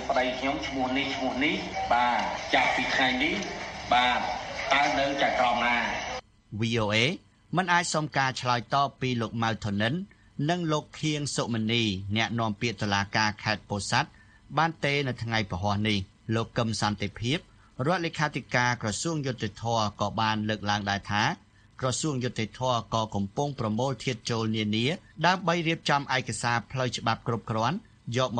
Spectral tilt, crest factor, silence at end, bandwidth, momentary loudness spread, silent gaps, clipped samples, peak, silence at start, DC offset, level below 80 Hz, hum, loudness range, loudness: -4.5 dB/octave; 22 dB; 0 s; 10 kHz; 7 LU; none; under 0.1%; -8 dBFS; 0 s; under 0.1%; -54 dBFS; none; 4 LU; -28 LUFS